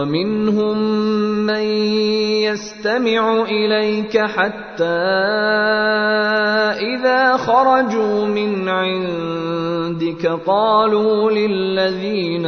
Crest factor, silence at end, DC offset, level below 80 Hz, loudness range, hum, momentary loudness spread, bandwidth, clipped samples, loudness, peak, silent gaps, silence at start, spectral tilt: 14 dB; 0 s; under 0.1%; -56 dBFS; 2 LU; none; 7 LU; 6.6 kHz; under 0.1%; -17 LUFS; -2 dBFS; none; 0 s; -5.5 dB/octave